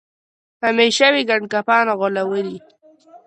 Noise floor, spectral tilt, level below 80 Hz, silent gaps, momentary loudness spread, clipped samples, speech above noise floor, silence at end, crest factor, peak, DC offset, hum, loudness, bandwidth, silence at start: -47 dBFS; -3 dB/octave; -70 dBFS; none; 11 LU; under 0.1%; 30 dB; 0.1 s; 18 dB; -2 dBFS; under 0.1%; none; -17 LUFS; 9.8 kHz; 0.6 s